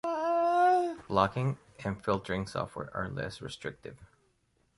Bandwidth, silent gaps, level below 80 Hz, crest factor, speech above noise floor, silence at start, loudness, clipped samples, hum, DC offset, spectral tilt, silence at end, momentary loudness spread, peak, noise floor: 11.5 kHz; none; -58 dBFS; 22 dB; 39 dB; 0.05 s; -31 LUFS; under 0.1%; none; under 0.1%; -6.5 dB/octave; 0.7 s; 15 LU; -10 dBFS; -72 dBFS